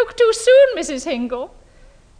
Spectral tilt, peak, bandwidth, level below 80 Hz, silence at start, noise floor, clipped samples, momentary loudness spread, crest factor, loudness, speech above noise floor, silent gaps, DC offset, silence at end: -2 dB/octave; -4 dBFS; 10 kHz; -48 dBFS; 0 s; -47 dBFS; under 0.1%; 16 LU; 12 dB; -16 LUFS; 31 dB; none; under 0.1%; 0.75 s